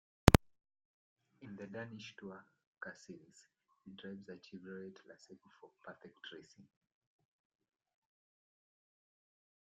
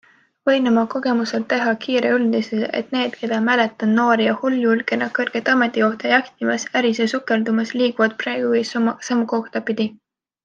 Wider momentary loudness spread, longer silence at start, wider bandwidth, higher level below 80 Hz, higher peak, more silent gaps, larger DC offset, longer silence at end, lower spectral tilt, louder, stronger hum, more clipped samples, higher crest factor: first, 28 LU vs 6 LU; second, 0.25 s vs 0.45 s; first, 8.8 kHz vs 7.4 kHz; first, -52 dBFS vs -70 dBFS; about the same, -4 dBFS vs -2 dBFS; first, 0.85-1.16 s, 2.67-2.73 s vs none; neither; first, 3.2 s vs 0.5 s; about the same, -5.5 dB/octave vs -4.5 dB/octave; second, -35 LUFS vs -19 LUFS; neither; neither; first, 38 dB vs 16 dB